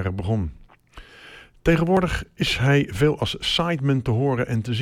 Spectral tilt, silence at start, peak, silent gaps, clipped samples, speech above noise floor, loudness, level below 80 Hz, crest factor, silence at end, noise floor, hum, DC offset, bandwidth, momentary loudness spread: -6 dB/octave; 0 s; -6 dBFS; none; under 0.1%; 25 dB; -22 LUFS; -38 dBFS; 16 dB; 0 s; -46 dBFS; none; under 0.1%; 15.5 kHz; 7 LU